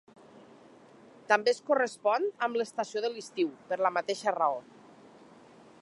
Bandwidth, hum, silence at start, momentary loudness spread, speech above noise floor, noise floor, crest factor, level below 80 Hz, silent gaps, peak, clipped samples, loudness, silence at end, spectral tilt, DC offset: 11.5 kHz; none; 1.3 s; 7 LU; 26 dB; -55 dBFS; 24 dB; -86 dBFS; none; -8 dBFS; under 0.1%; -30 LUFS; 1.2 s; -3 dB/octave; under 0.1%